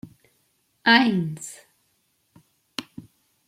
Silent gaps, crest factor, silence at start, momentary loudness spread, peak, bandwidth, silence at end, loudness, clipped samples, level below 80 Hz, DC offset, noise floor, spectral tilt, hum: none; 24 dB; 0.05 s; 21 LU; -2 dBFS; 15.5 kHz; 0.45 s; -20 LUFS; under 0.1%; -70 dBFS; under 0.1%; -69 dBFS; -4 dB/octave; none